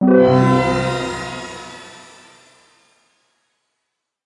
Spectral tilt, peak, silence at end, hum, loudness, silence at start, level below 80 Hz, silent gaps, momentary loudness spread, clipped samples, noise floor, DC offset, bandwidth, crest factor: -7 dB/octave; -2 dBFS; 2.35 s; none; -16 LUFS; 0 s; -46 dBFS; none; 25 LU; under 0.1%; -77 dBFS; under 0.1%; 11.5 kHz; 18 dB